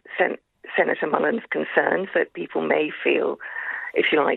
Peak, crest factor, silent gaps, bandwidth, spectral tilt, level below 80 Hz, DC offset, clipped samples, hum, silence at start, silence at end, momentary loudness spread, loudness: -2 dBFS; 20 dB; none; 4.2 kHz; -7.5 dB/octave; -72 dBFS; under 0.1%; under 0.1%; none; 0.1 s; 0 s; 7 LU; -23 LUFS